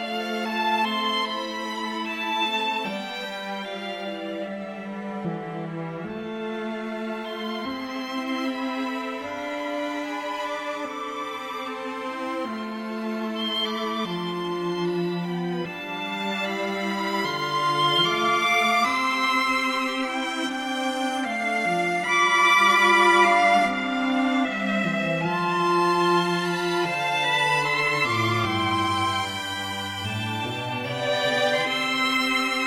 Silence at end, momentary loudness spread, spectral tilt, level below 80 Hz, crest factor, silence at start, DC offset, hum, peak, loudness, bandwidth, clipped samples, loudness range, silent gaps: 0 s; 12 LU; -4 dB/octave; -66 dBFS; 18 dB; 0 s; under 0.1%; none; -6 dBFS; -24 LUFS; 16 kHz; under 0.1%; 11 LU; none